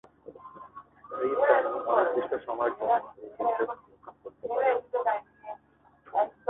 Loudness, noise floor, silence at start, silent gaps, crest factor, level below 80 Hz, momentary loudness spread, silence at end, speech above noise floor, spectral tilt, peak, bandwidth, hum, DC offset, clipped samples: -28 LUFS; -62 dBFS; 0.25 s; none; 22 dB; -70 dBFS; 22 LU; 0.2 s; 34 dB; -8 dB/octave; -8 dBFS; 4 kHz; none; under 0.1%; under 0.1%